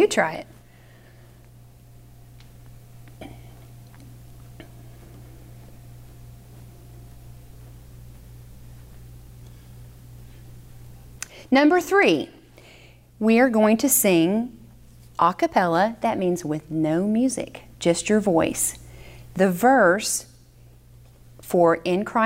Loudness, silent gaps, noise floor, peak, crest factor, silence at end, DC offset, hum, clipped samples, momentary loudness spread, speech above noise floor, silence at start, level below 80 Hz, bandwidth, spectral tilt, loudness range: -21 LUFS; none; -50 dBFS; -6 dBFS; 18 dB; 0 s; under 0.1%; none; under 0.1%; 23 LU; 30 dB; 0 s; -52 dBFS; 16 kHz; -4.5 dB/octave; 4 LU